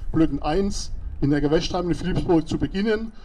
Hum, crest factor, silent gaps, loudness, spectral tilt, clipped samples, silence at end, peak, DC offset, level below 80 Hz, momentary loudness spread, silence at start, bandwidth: none; 14 dB; none; -23 LUFS; -6.5 dB/octave; under 0.1%; 0 s; -8 dBFS; under 0.1%; -32 dBFS; 6 LU; 0 s; 11 kHz